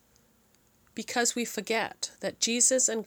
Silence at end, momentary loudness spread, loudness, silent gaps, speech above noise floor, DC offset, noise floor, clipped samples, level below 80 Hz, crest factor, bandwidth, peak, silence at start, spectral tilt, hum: 0 s; 12 LU; -27 LUFS; none; 36 dB; under 0.1%; -65 dBFS; under 0.1%; -74 dBFS; 20 dB; over 20 kHz; -10 dBFS; 0.95 s; -1 dB/octave; none